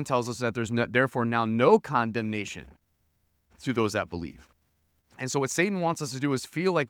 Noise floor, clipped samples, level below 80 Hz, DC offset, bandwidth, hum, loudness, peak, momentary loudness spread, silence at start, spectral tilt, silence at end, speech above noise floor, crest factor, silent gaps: -72 dBFS; under 0.1%; -62 dBFS; under 0.1%; 18 kHz; none; -27 LUFS; -6 dBFS; 14 LU; 0 s; -5 dB/octave; 0.05 s; 45 dB; 22 dB; none